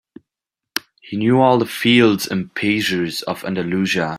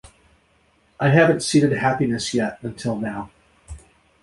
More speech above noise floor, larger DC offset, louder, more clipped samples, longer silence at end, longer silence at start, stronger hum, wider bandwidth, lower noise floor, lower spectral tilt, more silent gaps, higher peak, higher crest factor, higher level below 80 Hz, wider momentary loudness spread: first, 67 dB vs 41 dB; neither; about the same, -18 LUFS vs -20 LUFS; neither; second, 0 s vs 0.45 s; second, 0.75 s vs 1 s; neither; first, 16 kHz vs 11.5 kHz; first, -85 dBFS vs -61 dBFS; about the same, -5 dB/octave vs -5.5 dB/octave; neither; about the same, -2 dBFS vs -2 dBFS; about the same, 18 dB vs 20 dB; second, -58 dBFS vs -50 dBFS; about the same, 14 LU vs 13 LU